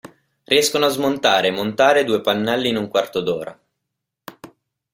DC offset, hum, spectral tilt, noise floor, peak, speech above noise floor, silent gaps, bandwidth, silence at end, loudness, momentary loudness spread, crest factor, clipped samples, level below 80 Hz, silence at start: under 0.1%; none; -3 dB/octave; -80 dBFS; 0 dBFS; 62 dB; none; 16.5 kHz; 0.5 s; -18 LUFS; 8 LU; 20 dB; under 0.1%; -60 dBFS; 0.05 s